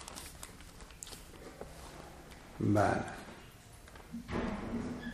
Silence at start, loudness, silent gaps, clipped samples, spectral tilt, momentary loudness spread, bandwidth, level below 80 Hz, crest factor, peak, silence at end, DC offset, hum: 0 s; -37 LUFS; none; under 0.1%; -6 dB/octave; 21 LU; 15.5 kHz; -54 dBFS; 24 dB; -14 dBFS; 0 s; under 0.1%; none